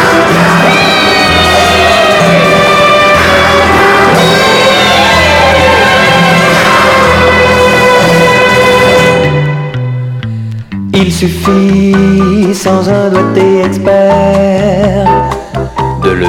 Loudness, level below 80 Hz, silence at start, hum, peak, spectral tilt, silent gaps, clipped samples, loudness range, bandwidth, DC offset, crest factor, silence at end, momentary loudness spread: -6 LUFS; -28 dBFS; 0 s; none; 0 dBFS; -5 dB/octave; none; 2%; 4 LU; 17.5 kHz; under 0.1%; 6 dB; 0 s; 8 LU